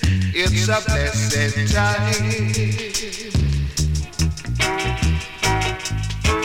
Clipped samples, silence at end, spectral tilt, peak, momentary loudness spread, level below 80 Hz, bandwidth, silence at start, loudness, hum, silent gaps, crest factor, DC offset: under 0.1%; 0 s; -4 dB/octave; -4 dBFS; 5 LU; -28 dBFS; 16.5 kHz; 0 s; -20 LUFS; none; none; 16 dB; under 0.1%